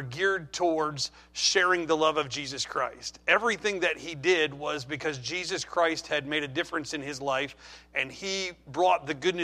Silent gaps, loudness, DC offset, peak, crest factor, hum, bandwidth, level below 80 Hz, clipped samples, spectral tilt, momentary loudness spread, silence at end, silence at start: none; -28 LUFS; under 0.1%; -6 dBFS; 22 dB; none; 13.5 kHz; -62 dBFS; under 0.1%; -3 dB/octave; 9 LU; 0 s; 0 s